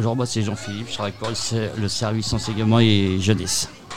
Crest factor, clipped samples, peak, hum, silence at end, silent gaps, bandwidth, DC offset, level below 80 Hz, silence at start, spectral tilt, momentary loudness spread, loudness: 18 dB; under 0.1%; -4 dBFS; none; 0 s; none; 15.5 kHz; 0.9%; -46 dBFS; 0 s; -5 dB/octave; 10 LU; -22 LUFS